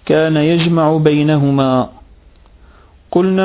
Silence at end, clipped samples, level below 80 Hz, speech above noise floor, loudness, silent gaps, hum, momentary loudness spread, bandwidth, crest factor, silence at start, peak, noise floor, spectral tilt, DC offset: 0 s; under 0.1%; -44 dBFS; 32 dB; -13 LUFS; none; none; 6 LU; 4 kHz; 14 dB; 0.05 s; 0 dBFS; -44 dBFS; -11.5 dB/octave; under 0.1%